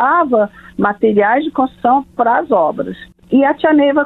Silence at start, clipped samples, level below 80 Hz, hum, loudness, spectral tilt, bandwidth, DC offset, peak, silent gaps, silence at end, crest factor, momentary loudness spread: 0 s; under 0.1%; -50 dBFS; none; -14 LUFS; -8.5 dB/octave; 4.1 kHz; under 0.1%; 0 dBFS; none; 0 s; 14 dB; 7 LU